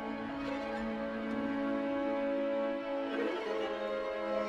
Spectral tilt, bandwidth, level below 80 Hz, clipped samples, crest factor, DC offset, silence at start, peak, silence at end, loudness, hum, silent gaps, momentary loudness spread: -6 dB/octave; 9.2 kHz; -62 dBFS; under 0.1%; 12 dB; under 0.1%; 0 s; -22 dBFS; 0 s; -36 LUFS; none; none; 4 LU